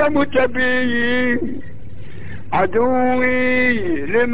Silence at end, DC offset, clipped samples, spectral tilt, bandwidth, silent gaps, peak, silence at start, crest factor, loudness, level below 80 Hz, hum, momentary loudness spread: 0 s; 7%; under 0.1%; -9 dB/octave; 4 kHz; none; -4 dBFS; 0 s; 14 dB; -17 LUFS; -42 dBFS; none; 19 LU